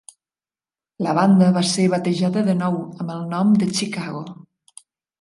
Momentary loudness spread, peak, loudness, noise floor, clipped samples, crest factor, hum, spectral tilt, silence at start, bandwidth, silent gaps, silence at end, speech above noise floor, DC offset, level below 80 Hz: 14 LU; -4 dBFS; -19 LUFS; under -90 dBFS; under 0.1%; 16 dB; none; -6 dB/octave; 1 s; 11.5 kHz; none; 0.85 s; over 71 dB; under 0.1%; -66 dBFS